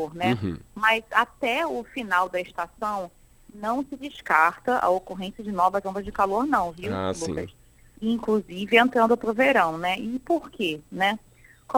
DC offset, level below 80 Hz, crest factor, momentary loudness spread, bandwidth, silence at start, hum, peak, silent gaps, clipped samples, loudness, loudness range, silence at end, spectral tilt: under 0.1%; -54 dBFS; 22 dB; 13 LU; 18.5 kHz; 0 s; none; -2 dBFS; none; under 0.1%; -25 LUFS; 4 LU; 0 s; -5 dB/octave